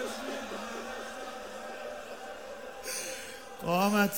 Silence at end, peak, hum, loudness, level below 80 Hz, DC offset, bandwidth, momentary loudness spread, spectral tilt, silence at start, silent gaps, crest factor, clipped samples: 0 s; -14 dBFS; none; -36 LUFS; -64 dBFS; 0.2%; 17.5 kHz; 14 LU; -4 dB/octave; 0 s; none; 20 dB; under 0.1%